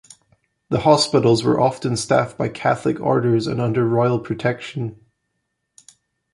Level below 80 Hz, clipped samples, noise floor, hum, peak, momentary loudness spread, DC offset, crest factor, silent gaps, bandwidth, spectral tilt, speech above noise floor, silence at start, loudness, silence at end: -54 dBFS; under 0.1%; -75 dBFS; none; -2 dBFS; 9 LU; under 0.1%; 18 dB; none; 11.5 kHz; -6 dB/octave; 56 dB; 0.7 s; -19 LUFS; 1.4 s